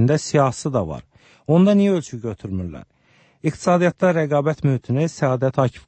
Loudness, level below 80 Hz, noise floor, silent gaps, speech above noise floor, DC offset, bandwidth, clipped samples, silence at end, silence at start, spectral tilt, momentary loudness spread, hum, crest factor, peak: -20 LUFS; -52 dBFS; -57 dBFS; none; 38 dB; under 0.1%; 8.8 kHz; under 0.1%; 0.1 s; 0 s; -7 dB/octave; 14 LU; none; 16 dB; -4 dBFS